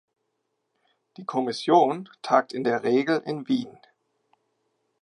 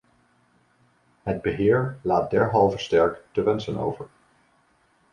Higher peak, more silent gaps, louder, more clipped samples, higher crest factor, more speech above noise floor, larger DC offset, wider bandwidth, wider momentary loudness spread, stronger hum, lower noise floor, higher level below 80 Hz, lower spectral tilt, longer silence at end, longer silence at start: about the same, -6 dBFS vs -6 dBFS; neither; about the same, -24 LUFS vs -23 LUFS; neither; about the same, 20 dB vs 20 dB; first, 53 dB vs 41 dB; neither; first, 11.5 kHz vs 9.6 kHz; about the same, 12 LU vs 10 LU; neither; first, -77 dBFS vs -64 dBFS; second, -82 dBFS vs -52 dBFS; about the same, -6 dB/octave vs -7 dB/octave; first, 1.3 s vs 1.05 s; about the same, 1.2 s vs 1.25 s